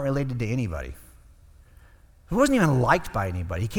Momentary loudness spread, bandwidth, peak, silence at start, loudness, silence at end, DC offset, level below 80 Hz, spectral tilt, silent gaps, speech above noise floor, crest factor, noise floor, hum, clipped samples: 11 LU; 18.5 kHz; -4 dBFS; 0 s; -24 LUFS; 0 s; under 0.1%; -42 dBFS; -6.5 dB/octave; none; 29 dB; 22 dB; -53 dBFS; none; under 0.1%